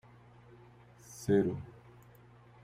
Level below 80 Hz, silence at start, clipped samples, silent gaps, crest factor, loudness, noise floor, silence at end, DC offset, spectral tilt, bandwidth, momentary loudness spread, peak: -66 dBFS; 1.1 s; under 0.1%; none; 20 dB; -33 LUFS; -58 dBFS; 0.95 s; under 0.1%; -7 dB/octave; 15.5 kHz; 27 LU; -18 dBFS